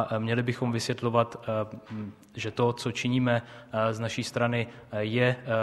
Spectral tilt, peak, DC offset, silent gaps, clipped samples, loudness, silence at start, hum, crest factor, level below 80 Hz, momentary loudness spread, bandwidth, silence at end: -6 dB/octave; -8 dBFS; under 0.1%; none; under 0.1%; -29 LUFS; 0 s; none; 20 dB; -64 dBFS; 10 LU; 12.5 kHz; 0 s